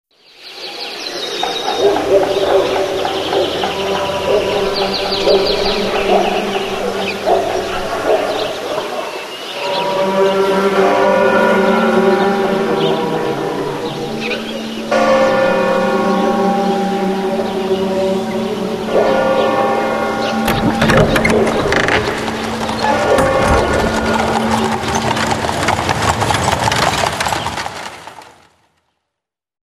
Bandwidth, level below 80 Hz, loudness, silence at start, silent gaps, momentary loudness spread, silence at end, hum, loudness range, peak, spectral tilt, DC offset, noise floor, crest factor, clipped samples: 15 kHz; -36 dBFS; -15 LUFS; 0.4 s; none; 9 LU; 1.35 s; none; 3 LU; 0 dBFS; -4.5 dB/octave; under 0.1%; -80 dBFS; 16 dB; under 0.1%